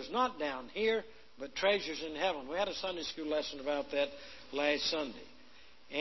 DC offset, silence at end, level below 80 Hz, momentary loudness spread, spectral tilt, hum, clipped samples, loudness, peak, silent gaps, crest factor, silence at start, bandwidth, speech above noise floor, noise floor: 0.2%; 0 s; -66 dBFS; 11 LU; -3 dB/octave; none; under 0.1%; -35 LUFS; -16 dBFS; none; 20 dB; 0 s; 6.2 kHz; 25 dB; -61 dBFS